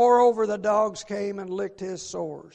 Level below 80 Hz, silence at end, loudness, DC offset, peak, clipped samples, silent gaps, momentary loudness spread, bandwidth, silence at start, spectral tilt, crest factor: -64 dBFS; 0.05 s; -25 LUFS; under 0.1%; -8 dBFS; under 0.1%; none; 14 LU; 8.8 kHz; 0 s; -5 dB/octave; 16 dB